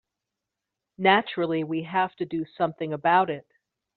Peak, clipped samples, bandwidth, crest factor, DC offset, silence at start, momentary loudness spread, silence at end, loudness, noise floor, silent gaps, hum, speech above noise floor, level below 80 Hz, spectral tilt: -4 dBFS; under 0.1%; 4.5 kHz; 22 dB; under 0.1%; 1 s; 9 LU; 0.55 s; -25 LUFS; -86 dBFS; none; none; 61 dB; -70 dBFS; -3 dB/octave